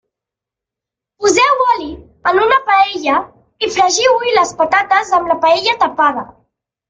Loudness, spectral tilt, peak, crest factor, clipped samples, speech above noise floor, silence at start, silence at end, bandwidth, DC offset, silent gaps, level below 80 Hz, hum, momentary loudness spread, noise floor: -13 LUFS; -1.5 dB/octave; 0 dBFS; 14 dB; under 0.1%; 72 dB; 1.2 s; 0.65 s; 9.6 kHz; under 0.1%; none; -50 dBFS; none; 8 LU; -85 dBFS